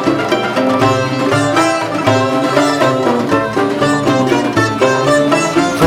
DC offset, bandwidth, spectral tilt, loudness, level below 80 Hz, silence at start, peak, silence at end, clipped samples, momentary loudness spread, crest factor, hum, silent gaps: under 0.1%; 16.5 kHz; -5 dB/octave; -13 LUFS; -48 dBFS; 0 s; 0 dBFS; 0 s; under 0.1%; 3 LU; 12 dB; none; none